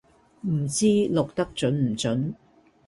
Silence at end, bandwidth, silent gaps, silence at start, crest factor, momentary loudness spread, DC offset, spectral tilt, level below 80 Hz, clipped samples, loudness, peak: 0.55 s; 11.5 kHz; none; 0.45 s; 16 dB; 11 LU; under 0.1%; -5.5 dB/octave; -56 dBFS; under 0.1%; -25 LUFS; -10 dBFS